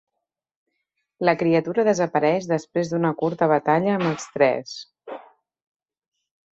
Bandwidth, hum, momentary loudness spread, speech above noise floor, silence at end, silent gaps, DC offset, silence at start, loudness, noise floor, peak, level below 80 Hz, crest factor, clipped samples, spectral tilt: 8.2 kHz; none; 17 LU; 61 dB; 1.35 s; none; under 0.1%; 1.2 s; -22 LUFS; -82 dBFS; -4 dBFS; -66 dBFS; 20 dB; under 0.1%; -6 dB/octave